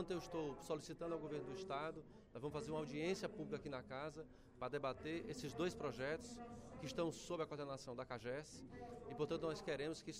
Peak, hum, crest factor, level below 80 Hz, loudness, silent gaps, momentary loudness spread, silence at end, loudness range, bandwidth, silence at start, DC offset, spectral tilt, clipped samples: -30 dBFS; none; 18 dB; -68 dBFS; -47 LUFS; none; 10 LU; 0 s; 1 LU; 15.5 kHz; 0 s; under 0.1%; -5 dB/octave; under 0.1%